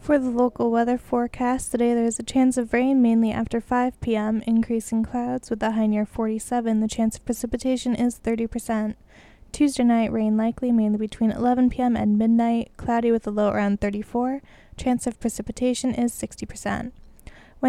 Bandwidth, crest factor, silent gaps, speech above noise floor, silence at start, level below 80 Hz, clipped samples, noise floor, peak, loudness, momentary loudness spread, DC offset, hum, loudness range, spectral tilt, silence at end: 13.5 kHz; 16 dB; none; 23 dB; 0 s; -46 dBFS; under 0.1%; -46 dBFS; -8 dBFS; -23 LUFS; 8 LU; under 0.1%; none; 4 LU; -5.5 dB/octave; 0 s